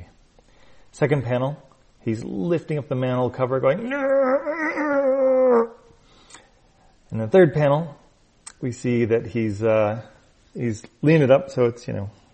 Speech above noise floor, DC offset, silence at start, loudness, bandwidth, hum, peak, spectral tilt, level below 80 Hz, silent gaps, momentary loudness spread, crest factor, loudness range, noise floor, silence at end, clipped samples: 35 dB; under 0.1%; 0 s; -21 LUFS; 8.4 kHz; none; -4 dBFS; -7.5 dB/octave; -56 dBFS; none; 14 LU; 18 dB; 4 LU; -56 dBFS; 0.25 s; under 0.1%